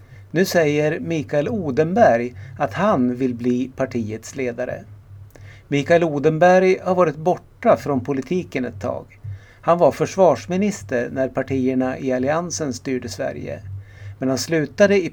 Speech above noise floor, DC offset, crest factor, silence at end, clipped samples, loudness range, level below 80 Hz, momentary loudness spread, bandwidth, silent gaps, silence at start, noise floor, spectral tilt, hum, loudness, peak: 22 dB; under 0.1%; 18 dB; 0 s; under 0.1%; 5 LU; -52 dBFS; 12 LU; 18.5 kHz; none; 0 s; -41 dBFS; -6 dB/octave; none; -20 LUFS; -2 dBFS